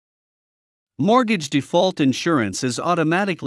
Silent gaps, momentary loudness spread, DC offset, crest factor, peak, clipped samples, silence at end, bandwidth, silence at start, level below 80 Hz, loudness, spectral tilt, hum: none; 5 LU; under 0.1%; 16 dB; -4 dBFS; under 0.1%; 0 s; 12 kHz; 1 s; -68 dBFS; -19 LUFS; -5 dB/octave; none